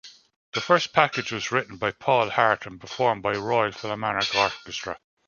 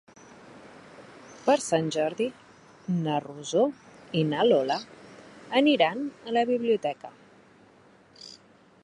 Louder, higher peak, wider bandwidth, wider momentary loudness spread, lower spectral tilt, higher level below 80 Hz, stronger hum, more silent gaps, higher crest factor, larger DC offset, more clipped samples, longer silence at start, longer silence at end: about the same, -24 LUFS vs -26 LUFS; first, -2 dBFS vs -8 dBFS; second, 7.2 kHz vs 11.5 kHz; second, 11 LU vs 25 LU; second, -3.5 dB/octave vs -5 dB/octave; first, -60 dBFS vs -74 dBFS; neither; first, 0.36-0.52 s vs none; about the same, 24 dB vs 20 dB; neither; neither; second, 0.05 s vs 0.45 s; second, 0.3 s vs 0.5 s